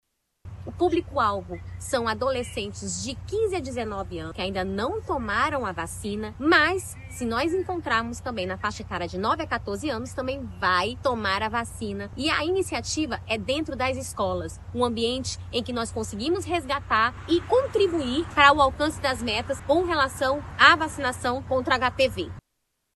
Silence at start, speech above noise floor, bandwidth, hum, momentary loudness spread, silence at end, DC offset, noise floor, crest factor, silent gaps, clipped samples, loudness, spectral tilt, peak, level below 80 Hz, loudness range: 0.45 s; 51 dB; 13 kHz; none; 11 LU; 0.55 s; under 0.1%; -77 dBFS; 24 dB; none; under 0.1%; -25 LUFS; -4 dB/octave; -2 dBFS; -46 dBFS; 6 LU